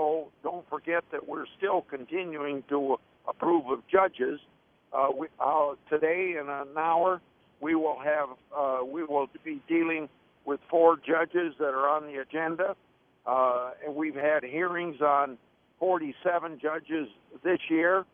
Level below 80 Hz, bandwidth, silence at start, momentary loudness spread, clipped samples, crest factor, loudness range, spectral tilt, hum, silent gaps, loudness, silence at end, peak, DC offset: -74 dBFS; 3.6 kHz; 0 s; 10 LU; under 0.1%; 20 dB; 3 LU; -8.5 dB/octave; none; none; -29 LUFS; 0.1 s; -8 dBFS; under 0.1%